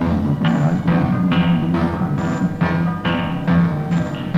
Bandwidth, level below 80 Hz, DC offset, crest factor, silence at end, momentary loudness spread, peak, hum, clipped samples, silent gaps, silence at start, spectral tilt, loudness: 7.6 kHz; -38 dBFS; under 0.1%; 14 dB; 0 s; 4 LU; -4 dBFS; none; under 0.1%; none; 0 s; -8 dB/octave; -18 LUFS